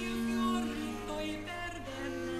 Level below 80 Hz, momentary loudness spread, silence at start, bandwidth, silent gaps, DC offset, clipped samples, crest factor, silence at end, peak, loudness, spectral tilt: -50 dBFS; 8 LU; 0 s; 14 kHz; none; under 0.1%; under 0.1%; 14 dB; 0 s; -22 dBFS; -36 LUFS; -4.5 dB/octave